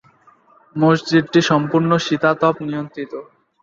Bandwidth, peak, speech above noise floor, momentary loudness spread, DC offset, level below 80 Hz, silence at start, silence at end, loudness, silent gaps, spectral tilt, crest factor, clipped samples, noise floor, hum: 7.6 kHz; -2 dBFS; 35 dB; 15 LU; under 0.1%; -60 dBFS; 0.75 s; 0.4 s; -17 LUFS; none; -6 dB/octave; 16 dB; under 0.1%; -52 dBFS; none